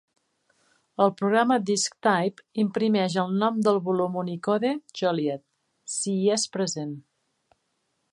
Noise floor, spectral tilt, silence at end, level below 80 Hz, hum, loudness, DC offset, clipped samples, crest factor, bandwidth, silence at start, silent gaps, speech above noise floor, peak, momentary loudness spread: -75 dBFS; -4.5 dB/octave; 1.1 s; -76 dBFS; none; -25 LUFS; under 0.1%; under 0.1%; 20 dB; 11.5 kHz; 1 s; none; 50 dB; -6 dBFS; 10 LU